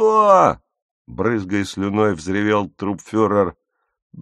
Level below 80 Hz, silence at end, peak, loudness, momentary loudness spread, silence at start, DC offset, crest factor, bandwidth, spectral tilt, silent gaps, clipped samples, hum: -52 dBFS; 0 s; 0 dBFS; -18 LUFS; 13 LU; 0 s; under 0.1%; 18 dB; 11.5 kHz; -6.5 dB/octave; 0.82-1.05 s, 4.02-4.10 s; under 0.1%; none